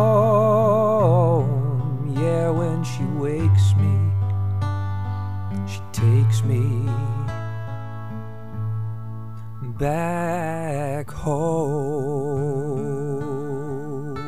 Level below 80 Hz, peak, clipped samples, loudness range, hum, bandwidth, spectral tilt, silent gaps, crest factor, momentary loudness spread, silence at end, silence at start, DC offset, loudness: -48 dBFS; -6 dBFS; under 0.1%; 8 LU; none; 13.5 kHz; -8 dB/octave; none; 16 dB; 14 LU; 0 s; 0 s; 2%; -22 LUFS